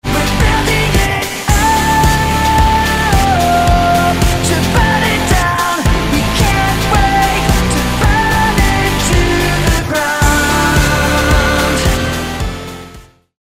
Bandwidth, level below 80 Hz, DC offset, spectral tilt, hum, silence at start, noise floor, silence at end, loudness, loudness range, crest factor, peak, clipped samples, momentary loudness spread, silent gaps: 16 kHz; -18 dBFS; under 0.1%; -4.5 dB/octave; none; 0.05 s; -37 dBFS; 0.4 s; -12 LUFS; 1 LU; 12 dB; 0 dBFS; under 0.1%; 3 LU; none